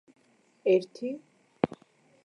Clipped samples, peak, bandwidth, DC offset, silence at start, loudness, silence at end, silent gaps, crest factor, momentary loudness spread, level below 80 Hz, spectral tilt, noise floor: under 0.1%; -8 dBFS; 10.5 kHz; under 0.1%; 0.65 s; -30 LUFS; 0.6 s; none; 24 dB; 16 LU; -70 dBFS; -7 dB/octave; -63 dBFS